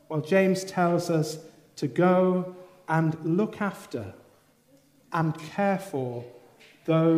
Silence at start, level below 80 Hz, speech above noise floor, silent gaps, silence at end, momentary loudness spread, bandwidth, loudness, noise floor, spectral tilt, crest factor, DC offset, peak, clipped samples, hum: 0.1 s; -74 dBFS; 36 dB; none; 0 s; 16 LU; 15.5 kHz; -26 LUFS; -61 dBFS; -7 dB/octave; 18 dB; under 0.1%; -10 dBFS; under 0.1%; none